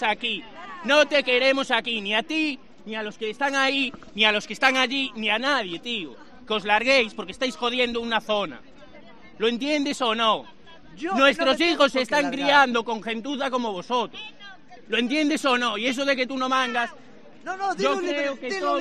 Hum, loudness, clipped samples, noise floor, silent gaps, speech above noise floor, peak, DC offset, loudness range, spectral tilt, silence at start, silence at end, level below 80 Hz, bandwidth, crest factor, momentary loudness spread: none; -23 LUFS; under 0.1%; -48 dBFS; none; 25 dB; -2 dBFS; 0.4%; 4 LU; -3 dB/octave; 0 s; 0 s; -62 dBFS; 13 kHz; 22 dB; 12 LU